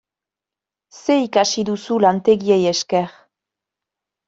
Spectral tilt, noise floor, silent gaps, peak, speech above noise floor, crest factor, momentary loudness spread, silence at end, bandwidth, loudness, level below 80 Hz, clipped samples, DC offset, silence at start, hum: -4.5 dB/octave; -88 dBFS; none; -2 dBFS; 71 dB; 18 dB; 7 LU; 1.15 s; 8 kHz; -18 LUFS; -62 dBFS; under 0.1%; under 0.1%; 0.95 s; none